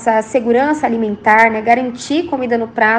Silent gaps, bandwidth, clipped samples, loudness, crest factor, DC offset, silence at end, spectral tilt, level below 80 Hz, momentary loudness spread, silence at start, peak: none; 9.8 kHz; under 0.1%; -14 LUFS; 14 dB; under 0.1%; 0 s; -4.5 dB/octave; -54 dBFS; 8 LU; 0 s; 0 dBFS